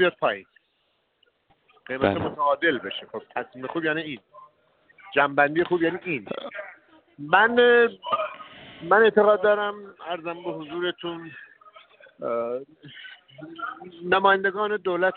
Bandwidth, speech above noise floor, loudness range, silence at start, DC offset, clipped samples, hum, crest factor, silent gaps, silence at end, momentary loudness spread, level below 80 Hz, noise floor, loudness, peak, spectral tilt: 4.5 kHz; 47 dB; 12 LU; 0 s; under 0.1%; under 0.1%; none; 22 dB; none; 0 s; 23 LU; -66 dBFS; -71 dBFS; -23 LUFS; -4 dBFS; -2 dB/octave